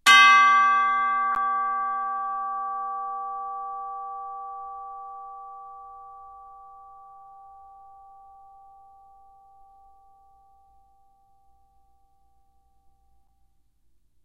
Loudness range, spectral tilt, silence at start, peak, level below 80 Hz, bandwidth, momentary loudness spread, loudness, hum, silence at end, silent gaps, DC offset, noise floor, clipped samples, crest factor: 27 LU; 1.5 dB/octave; 0.05 s; -2 dBFS; -68 dBFS; 15.5 kHz; 28 LU; -22 LUFS; none; 7.45 s; none; under 0.1%; -67 dBFS; under 0.1%; 24 dB